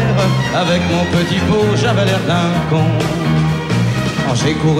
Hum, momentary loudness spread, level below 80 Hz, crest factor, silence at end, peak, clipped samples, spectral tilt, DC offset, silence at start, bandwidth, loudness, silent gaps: none; 2 LU; -36 dBFS; 8 dB; 0 s; -6 dBFS; under 0.1%; -6 dB/octave; under 0.1%; 0 s; 14.5 kHz; -15 LUFS; none